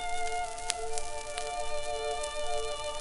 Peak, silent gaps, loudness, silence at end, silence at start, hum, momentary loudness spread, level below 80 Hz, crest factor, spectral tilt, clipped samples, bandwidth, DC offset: -2 dBFS; none; -35 LUFS; 0 s; 0 s; none; 3 LU; -44 dBFS; 30 dB; -1 dB/octave; under 0.1%; 11.5 kHz; under 0.1%